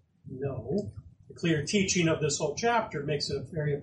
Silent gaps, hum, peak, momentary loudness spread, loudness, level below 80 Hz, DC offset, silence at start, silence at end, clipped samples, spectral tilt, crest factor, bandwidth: none; none; -14 dBFS; 10 LU; -29 LUFS; -58 dBFS; under 0.1%; 0.25 s; 0 s; under 0.1%; -4.5 dB/octave; 16 dB; 10 kHz